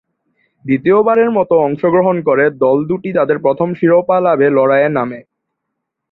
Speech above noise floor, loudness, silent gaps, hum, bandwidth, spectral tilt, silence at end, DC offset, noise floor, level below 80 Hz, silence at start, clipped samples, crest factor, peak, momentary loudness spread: 63 dB; -13 LUFS; none; none; 4.2 kHz; -10.5 dB/octave; 0.9 s; under 0.1%; -75 dBFS; -58 dBFS; 0.65 s; under 0.1%; 12 dB; -2 dBFS; 6 LU